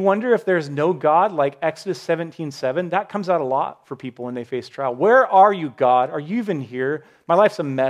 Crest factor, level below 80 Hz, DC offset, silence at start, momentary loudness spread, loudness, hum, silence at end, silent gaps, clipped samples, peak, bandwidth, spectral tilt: 16 dB; -74 dBFS; under 0.1%; 0 s; 14 LU; -20 LUFS; none; 0 s; none; under 0.1%; -2 dBFS; 12 kHz; -6.5 dB/octave